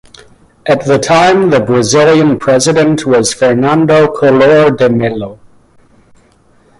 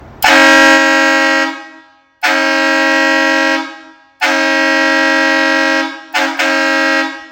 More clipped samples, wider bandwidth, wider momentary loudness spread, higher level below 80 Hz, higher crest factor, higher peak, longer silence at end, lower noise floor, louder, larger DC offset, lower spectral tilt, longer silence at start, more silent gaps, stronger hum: second, under 0.1% vs 0.4%; second, 11.5 kHz vs 17 kHz; second, 7 LU vs 10 LU; first, -44 dBFS vs -54 dBFS; about the same, 10 dB vs 12 dB; about the same, 0 dBFS vs 0 dBFS; first, 1.45 s vs 0.05 s; first, -47 dBFS vs -42 dBFS; about the same, -9 LUFS vs -10 LUFS; neither; first, -5 dB/octave vs -1 dB/octave; first, 0.65 s vs 0 s; neither; neither